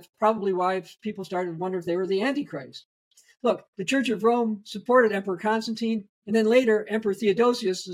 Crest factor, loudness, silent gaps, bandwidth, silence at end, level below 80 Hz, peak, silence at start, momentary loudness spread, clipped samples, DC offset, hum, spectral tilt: 18 dB; -25 LUFS; 2.85-3.11 s, 3.68-3.73 s, 6.09-6.22 s; 15 kHz; 0 s; -72 dBFS; -6 dBFS; 0.2 s; 11 LU; under 0.1%; under 0.1%; none; -5 dB/octave